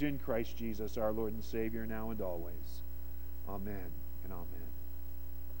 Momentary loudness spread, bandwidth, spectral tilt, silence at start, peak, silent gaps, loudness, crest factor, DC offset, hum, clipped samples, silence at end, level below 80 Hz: 11 LU; 17 kHz; -7 dB/octave; 0 s; -22 dBFS; none; -42 LUFS; 20 dB; 1%; none; under 0.1%; 0 s; -48 dBFS